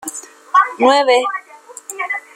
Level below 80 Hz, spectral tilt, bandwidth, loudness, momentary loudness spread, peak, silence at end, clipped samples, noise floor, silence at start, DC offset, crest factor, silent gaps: -66 dBFS; -1 dB/octave; 16 kHz; -15 LUFS; 19 LU; -2 dBFS; 0.15 s; under 0.1%; -36 dBFS; 0 s; under 0.1%; 16 dB; none